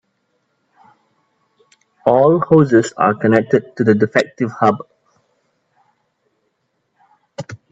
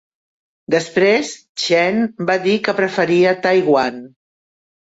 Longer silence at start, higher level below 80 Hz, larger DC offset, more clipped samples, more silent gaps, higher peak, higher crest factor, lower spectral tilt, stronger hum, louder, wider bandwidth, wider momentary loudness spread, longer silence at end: first, 2.05 s vs 0.7 s; about the same, -60 dBFS vs -62 dBFS; neither; neither; second, none vs 1.49-1.55 s; first, 0 dBFS vs -4 dBFS; about the same, 18 dB vs 14 dB; first, -7 dB/octave vs -4.5 dB/octave; neither; about the same, -15 LUFS vs -16 LUFS; about the same, 8 kHz vs 8 kHz; first, 19 LU vs 7 LU; second, 0.15 s vs 0.85 s